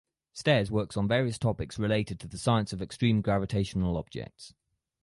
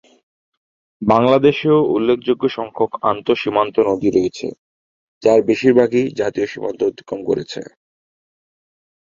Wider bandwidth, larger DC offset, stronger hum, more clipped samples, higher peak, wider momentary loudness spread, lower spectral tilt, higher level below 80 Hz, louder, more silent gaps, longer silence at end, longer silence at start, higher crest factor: first, 11.5 kHz vs 7.6 kHz; neither; neither; neither; second, -10 dBFS vs 0 dBFS; about the same, 11 LU vs 10 LU; about the same, -6.5 dB/octave vs -6.5 dB/octave; first, -50 dBFS vs -56 dBFS; second, -29 LUFS vs -17 LUFS; second, none vs 4.58-5.21 s; second, 0.55 s vs 1.4 s; second, 0.35 s vs 1 s; about the same, 20 dB vs 18 dB